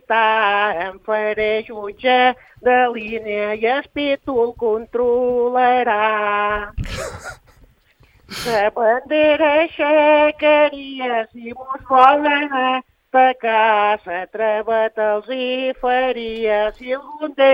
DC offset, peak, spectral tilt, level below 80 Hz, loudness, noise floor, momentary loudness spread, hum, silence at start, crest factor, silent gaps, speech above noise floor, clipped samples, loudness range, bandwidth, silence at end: under 0.1%; 0 dBFS; -4.5 dB/octave; -44 dBFS; -17 LUFS; -54 dBFS; 12 LU; none; 0.1 s; 18 dB; none; 36 dB; under 0.1%; 4 LU; 15.5 kHz; 0 s